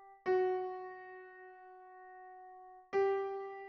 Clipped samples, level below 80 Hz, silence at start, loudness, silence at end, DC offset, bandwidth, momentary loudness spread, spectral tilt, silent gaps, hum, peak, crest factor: under 0.1%; -82 dBFS; 0 s; -36 LUFS; 0 s; under 0.1%; 6.2 kHz; 22 LU; -3.5 dB/octave; none; none; -22 dBFS; 16 dB